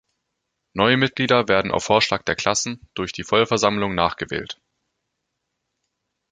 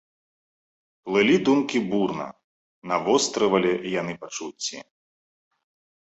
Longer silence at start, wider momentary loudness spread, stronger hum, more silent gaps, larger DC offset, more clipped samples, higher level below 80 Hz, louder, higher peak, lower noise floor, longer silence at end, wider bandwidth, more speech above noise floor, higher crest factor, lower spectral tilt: second, 0.75 s vs 1.05 s; second, 12 LU vs 15 LU; neither; second, none vs 2.44-2.82 s; neither; neither; first, -52 dBFS vs -66 dBFS; first, -20 LUFS vs -24 LUFS; first, 0 dBFS vs -6 dBFS; second, -78 dBFS vs under -90 dBFS; first, 1.8 s vs 1.3 s; first, 9.4 kHz vs 8.2 kHz; second, 57 dB vs over 67 dB; about the same, 22 dB vs 20 dB; about the same, -3.5 dB/octave vs -4 dB/octave